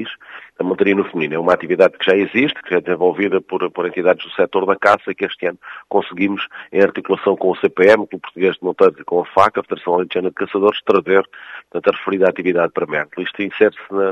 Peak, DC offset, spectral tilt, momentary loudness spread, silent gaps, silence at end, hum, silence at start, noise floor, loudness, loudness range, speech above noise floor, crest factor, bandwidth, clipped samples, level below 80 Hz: 0 dBFS; under 0.1%; -6.5 dB/octave; 9 LU; none; 0 s; none; 0 s; -36 dBFS; -17 LUFS; 2 LU; 20 dB; 16 dB; 8.2 kHz; under 0.1%; -62 dBFS